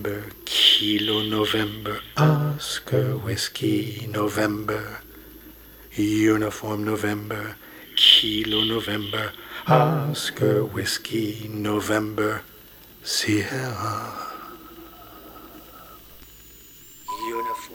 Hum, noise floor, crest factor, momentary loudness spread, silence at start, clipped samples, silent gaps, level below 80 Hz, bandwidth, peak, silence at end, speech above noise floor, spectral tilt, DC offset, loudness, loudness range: none; -47 dBFS; 22 dB; 23 LU; 0 s; under 0.1%; none; -54 dBFS; over 20 kHz; -2 dBFS; 0 s; 24 dB; -4.5 dB/octave; under 0.1%; -22 LUFS; 11 LU